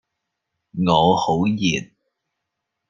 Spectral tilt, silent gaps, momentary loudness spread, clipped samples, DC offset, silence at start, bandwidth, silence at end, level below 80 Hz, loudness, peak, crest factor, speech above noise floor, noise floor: -5.5 dB/octave; none; 10 LU; under 0.1%; under 0.1%; 0.75 s; 7.4 kHz; 1.05 s; -54 dBFS; -19 LUFS; -2 dBFS; 20 dB; 61 dB; -80 dBFS